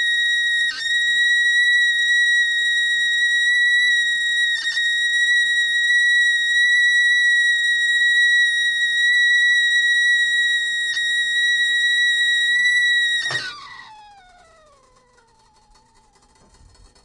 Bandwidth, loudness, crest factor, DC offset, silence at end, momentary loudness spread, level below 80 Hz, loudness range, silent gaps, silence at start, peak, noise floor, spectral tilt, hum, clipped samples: 11 kHz; -15 LUFS; 10 dB; under 0.1%; 3.1 s; 5 LU; -60 dBFS; 4 LU; none; 0 s; -10 dBFS; -56 dBFS; 3 dB/octave; none; under 0.1%